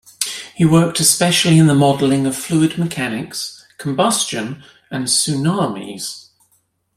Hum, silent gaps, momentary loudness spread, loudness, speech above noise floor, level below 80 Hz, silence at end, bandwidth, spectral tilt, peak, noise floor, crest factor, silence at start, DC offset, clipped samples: none; none; 16 LU; -16 LUFS; 47 dB; -54 dBFS; 0.75 s; 16 kHz; -4.5 dB/octave; 0 dBFS; -62 dBFS; 18 dB; 0.2 s; under 0.1%; under 0.1%